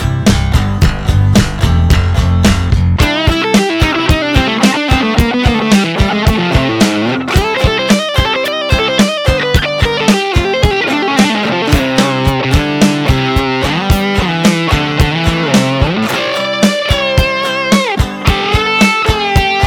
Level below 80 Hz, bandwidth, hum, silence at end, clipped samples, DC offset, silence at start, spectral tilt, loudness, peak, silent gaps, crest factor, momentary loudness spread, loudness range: -20 dBFS; 18.5 kHz; none; 0 s; under 0.1%; 0.2%; 0 s; -5 dB/octave; -11 LUFS; 0 dBFS; none; 10 dB; 3 LU; 1 LU